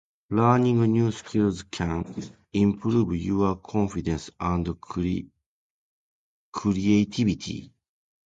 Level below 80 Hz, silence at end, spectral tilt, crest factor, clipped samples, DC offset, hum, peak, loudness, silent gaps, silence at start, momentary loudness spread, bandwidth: -46 dBFS; 0.6 s; -7 dB/octave; 18 dB; under 0.1%; under 0.1%; none; -8 dBFS; -25 LUFS; 5.46-6.52 s; 0.3 s; 11 LU; 8.8 kHz